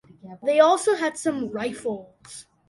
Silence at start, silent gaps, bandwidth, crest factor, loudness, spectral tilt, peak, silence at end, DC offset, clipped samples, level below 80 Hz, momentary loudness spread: 0.25 s; none; 11.5 kHz; 20 dB; -23 LUFS; -3.5 dB/octave; -4 dBFS; 0.3 s; under 0.1%; under 0.1%; -68 dBFS; 23 LU